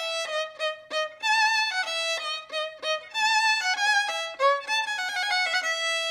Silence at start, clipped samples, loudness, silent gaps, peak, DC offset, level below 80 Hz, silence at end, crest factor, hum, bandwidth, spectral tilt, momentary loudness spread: 0 s; under 0.1%; -25 LUFS; none; -10 dBFS; under 0.1%; -78 dBFS; 0 s; 16 dB; none; 16.5 kHz; 3 dB/octave; 9 LU